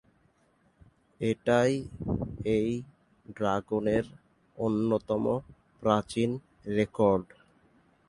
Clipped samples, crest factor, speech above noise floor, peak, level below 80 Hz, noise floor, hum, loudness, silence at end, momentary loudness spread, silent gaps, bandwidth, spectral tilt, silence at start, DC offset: under 0.1%; 22 dB; 40 dB; -8 dBFS; -54 dBFS; -68 dBFS; none; -29 LUFS; 0.85 s; 9 LU; none; 11.5 kHz; -7 dB/octave; 1.2 s; under 0.1%